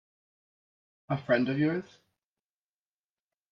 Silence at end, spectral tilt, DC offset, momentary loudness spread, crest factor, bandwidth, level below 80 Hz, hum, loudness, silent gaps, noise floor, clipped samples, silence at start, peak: 1.7 s; -8.5 dB/octave; under 0.1%; 9 LU; 22 dB; 6.8 kHz; -74 dBFS; none; -29 LUFS; none; under -90 dBFS; under 0.1%; 1.1 s; -14 dBFS